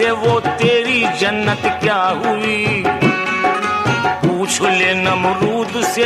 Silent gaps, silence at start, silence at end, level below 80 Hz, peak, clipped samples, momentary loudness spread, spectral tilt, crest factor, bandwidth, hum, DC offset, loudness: none; 0 s; 0 s; -52 dBFS; -2 dBFS; under 0.1%; 4 LU; -4 dB/octave; 14 dB; 14.5 kHz; none; under 0.1%; -15 LUFS